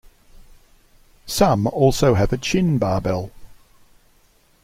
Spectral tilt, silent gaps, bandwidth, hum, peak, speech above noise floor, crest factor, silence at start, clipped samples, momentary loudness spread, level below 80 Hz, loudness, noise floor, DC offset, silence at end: -6 dB/octave; none; 16.5 kHz; none; -2 dBFS; 39 dB; 20 dB; 1.25 s; under 0.1%; 11 LU; -38 dBFS; -19 LUFS; -57 dBFS; under 0.1%; 1.1 s